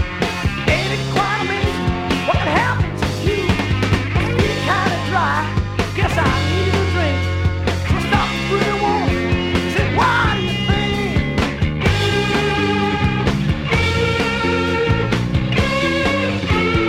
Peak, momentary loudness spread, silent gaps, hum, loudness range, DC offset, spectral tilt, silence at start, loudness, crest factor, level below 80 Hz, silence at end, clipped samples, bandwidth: -2 dBFS; 3 LU; none; none; 1 LU; under 0.1%; -5.5 dB/octave; 0 s; -18 LUFS; 16 dB; -28 dBFS; 0 s; under 0.1%; 15 kHz